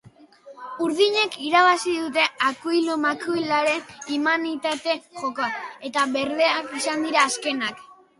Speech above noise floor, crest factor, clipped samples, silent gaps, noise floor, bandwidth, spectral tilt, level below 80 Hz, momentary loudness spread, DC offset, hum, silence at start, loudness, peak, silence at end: 25 dB; 18 dB; under 0.1%; none; -48 dBFS; 11.5 kHz; -2 dB/octave; -70 dBFS; 9 LU; under 0.1%; none; 0.45 s; -22 LUFS; -4 dBFS; 0.25 s